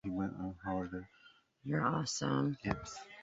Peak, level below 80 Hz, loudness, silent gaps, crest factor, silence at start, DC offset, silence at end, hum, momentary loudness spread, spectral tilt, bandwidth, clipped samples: -16 dBFS; -60 dBFS; -38 LUFS; none; 22 dB; 0.05 s; under 0.1%; 0 s; none; 14 LU; -5.5 dB/octave; 8 kHz; under 0.1%